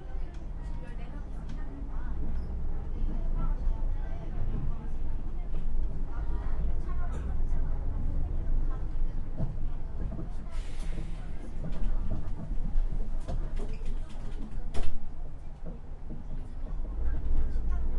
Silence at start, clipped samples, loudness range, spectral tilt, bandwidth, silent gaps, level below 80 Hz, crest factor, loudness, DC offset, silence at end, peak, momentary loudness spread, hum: 0 s; under 0.1%; 4 LU; -8 dB/octave; 3.5 kHz; none; -30 dBFS; 18 dB; -38 LUFS; under 0.1%; 0 s; -10 dBFS; 7 LU; none